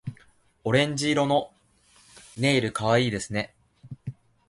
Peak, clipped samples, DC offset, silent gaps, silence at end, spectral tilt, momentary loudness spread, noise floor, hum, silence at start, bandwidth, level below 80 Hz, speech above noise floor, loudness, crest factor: -8 dBFS; under 0.1%; under 0.1%; none; 0.4 s; -5 dB/octave; 18 LU; -60 dBFS; none; 0.05 s; 11.5 kHz; -58 dBFS; 36 dB; -25 LUFS; 20 dB